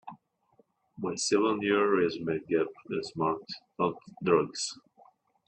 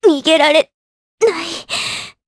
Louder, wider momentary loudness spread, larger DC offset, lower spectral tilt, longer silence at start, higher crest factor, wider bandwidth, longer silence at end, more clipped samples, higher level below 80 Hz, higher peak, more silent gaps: second, -30 LUFS vs -15 LUFS; about the same, 11 LU vs 12 LU; neither; first, -4.5 dB/octave vs -2 dB/octave; about the same, 0.05 s vs 0 s; first, 22 dB vs 16 dB; second, 9.8 kHz vs 11 kHz; first, 0.7 s vs 0.15 s; neither; second, -70 dBFS vs -60 dBFS; second, -10 dBFS vs 0 dBFS; second, none vs 0.74-1.18 s